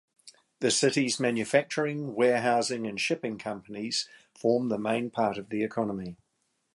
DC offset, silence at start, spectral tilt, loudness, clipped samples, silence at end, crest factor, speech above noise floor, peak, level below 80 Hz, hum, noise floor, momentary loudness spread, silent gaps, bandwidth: under 0.1%; 0.25 s; -4 dB/octave; -28 LUFS; under 0.1%; 0.6 s; 20 dB; 48 dB; -10 dBFS; -70 dBFS; none; -76 dBFS; 11 LU; none; 11.5 kHz